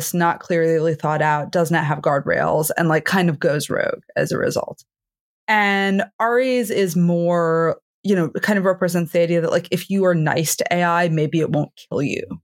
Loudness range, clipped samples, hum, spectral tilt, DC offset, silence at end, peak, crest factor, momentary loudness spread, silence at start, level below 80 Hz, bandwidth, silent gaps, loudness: 2 LU; under 0.1%; none; -5.5 dB/octave; under 0.1%; 0.05 s; -4 dBFS; 16 dB; 5 LU; 0 s; -64 dBFS; 17 kHz; 5.20-5.47 s, 6.13-6.19 s, 7.82-8.03 s; -19 LUFS